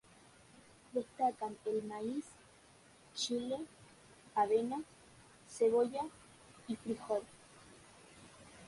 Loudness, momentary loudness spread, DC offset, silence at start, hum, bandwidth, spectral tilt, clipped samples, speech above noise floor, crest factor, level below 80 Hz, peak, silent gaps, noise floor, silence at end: -38 LUFS; 25 LU; under 0.1%; 0.95 s; none; 11.5 kHz; -4 dB/octave; under 0.1%; 27 dB; 18 dB; -74 dBFS; -22 dBFS; none; -63 dBFS; 0 s